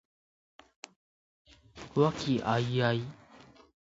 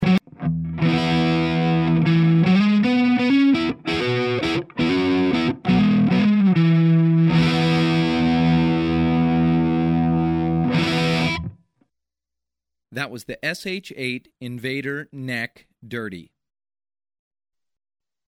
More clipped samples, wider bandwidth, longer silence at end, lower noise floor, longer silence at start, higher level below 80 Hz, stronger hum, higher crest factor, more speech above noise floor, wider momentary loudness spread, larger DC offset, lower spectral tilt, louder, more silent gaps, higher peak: neither; second, 7.8 kHz vs 11 kHz; second, 0.75 s vs 2.05 s; second, -57 dBFS vs -87 dBFS; first, 1.75 s vs 0 s; second, -64 dBFS vs -46 dBFS; neither; first, 22 dB vs 12 dB; second, 27 dB vs 58 dB; first, 22 LU vs 13 LU; neither; about the same, -6.5 dB/octave vs -7.5 dB/octave; second, -30 LUFS vs -19 LUFS; neither; second, -12 dBFS vs -8 dBFS